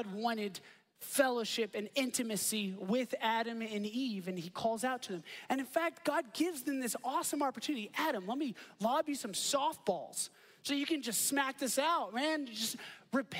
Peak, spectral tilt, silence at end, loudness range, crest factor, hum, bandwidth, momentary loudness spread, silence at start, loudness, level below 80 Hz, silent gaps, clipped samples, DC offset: -16 dBFS; -2.5 dB/octave; 0 s; 2 LU; 20 dB; none; 16 kHz; 8 LU; 0 s; -36 LUFS; -84 dBFS; none; under 0.1%; under 0.1%